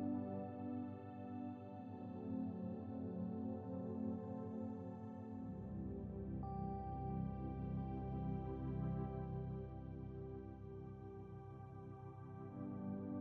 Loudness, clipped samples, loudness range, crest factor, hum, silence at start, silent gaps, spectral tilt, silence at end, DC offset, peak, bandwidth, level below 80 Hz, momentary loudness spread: -48 LUFS; under 0.1%; 6 LU; 14 dB; none; 0 s; none; -10.5 dB/octave; 0 s; under 0.1%; -32 dBFS; 4.5 kHz; -58 dBFS; 9 LU